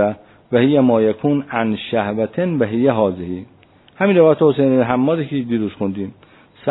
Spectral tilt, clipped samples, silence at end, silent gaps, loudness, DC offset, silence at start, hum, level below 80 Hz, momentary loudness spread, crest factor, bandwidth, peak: -11.5 dB/octave; under 0.1%; 0 s; none; -17 LUFS; under 0.1%; 0 s; none; -56 dBFS; 14 LU; 16 dB; 4.1 kHz; 0 dBFS